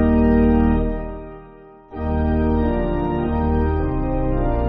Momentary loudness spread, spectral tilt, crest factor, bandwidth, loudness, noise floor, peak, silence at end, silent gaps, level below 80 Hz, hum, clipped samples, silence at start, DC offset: 17 LU; -9 dB/octave; 14 dB; 5 kHz; -20 LUFS; -43 dBFS; -6 dBFS; 0 s; none; -26 dBFS; none; under 0.1%; 0 s; under 0.1%